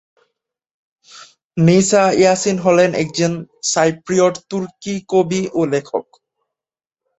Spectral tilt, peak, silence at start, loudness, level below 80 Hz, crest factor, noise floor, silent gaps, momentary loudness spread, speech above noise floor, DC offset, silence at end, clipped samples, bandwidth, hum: -5 dB/octave; -2 dBFS; 1.15 s; -16 LUFS; -56 dBFS; 16 dB; -89 dBFS; 1.45-1.50 s; 13 LU; 73 dB; under 0.1%; 1.2 s; under 0.1%; 8.4 kHz; none